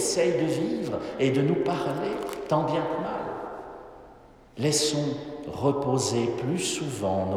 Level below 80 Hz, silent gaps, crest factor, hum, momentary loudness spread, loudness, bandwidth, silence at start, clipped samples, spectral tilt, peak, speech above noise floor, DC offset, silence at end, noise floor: -58 dBFS; none; 18 dB; none; 13 LU; -27 LUFS; 17 kHz; 0 s; under 0.1%; -4.5 dB/octave; -10 dBFS; 25 dB; under 0.1%; 0 s; -51 dBFS